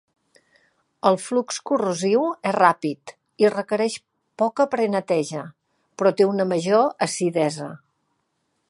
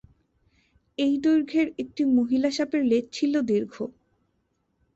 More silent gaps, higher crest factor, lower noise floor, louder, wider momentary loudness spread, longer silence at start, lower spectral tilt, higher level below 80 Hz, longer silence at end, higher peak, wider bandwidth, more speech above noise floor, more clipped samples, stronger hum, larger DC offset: neither; first, 22 dB vs 14 dB; about the same, -73 dBFS vs -73 dBFS; about the same, -22 LUFS vs -24 LUFS; about the same, 11 LU vs 11 LU; about the same, 1.05 s vs 1 s; about the same, -5 dB/octave vs -5 dB/octave; second, -74 dBFS vs -64 dBFS; about the same, 0.95 s vs 1.05 s; first, -2 dBFS vs -12 dBFS; first, 11.5 kHz vs 8 kHz; about the same, 52 dB vs 49 dB; neither; neither; neither